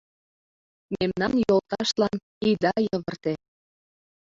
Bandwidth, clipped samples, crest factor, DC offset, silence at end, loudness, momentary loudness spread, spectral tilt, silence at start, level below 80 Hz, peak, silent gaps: 7.8 kHz; under 0.1%; 18 dB; under 0.1%; 1 s; -25 LUFS; 9 LU; -5.5 dB/octave; 0.9 s; -58 dBFS; -10 dBFS; 2.23-2.41 s